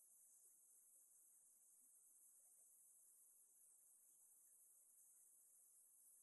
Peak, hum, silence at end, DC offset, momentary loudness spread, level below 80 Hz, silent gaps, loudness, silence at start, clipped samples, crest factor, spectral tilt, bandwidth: -58 dBFS; none; 0 s; under 0.1%; 1 LU; under -90 dBFS; none; -69 LUFS; 0 s; under 0.1%; 14 dB; 1.5 dB/octave; 12 kHz